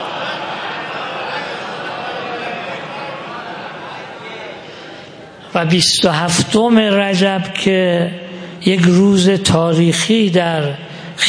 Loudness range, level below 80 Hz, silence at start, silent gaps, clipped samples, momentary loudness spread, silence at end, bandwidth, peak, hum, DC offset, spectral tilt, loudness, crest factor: 12 LU; -52 dBFS; 0 s; none; under 0.1%; 18 LU; 0 s; 10.5 kHz; 0 dBFS; none; under 0.1%; -4.5 dB/octave; -15 LUFS; 16 dB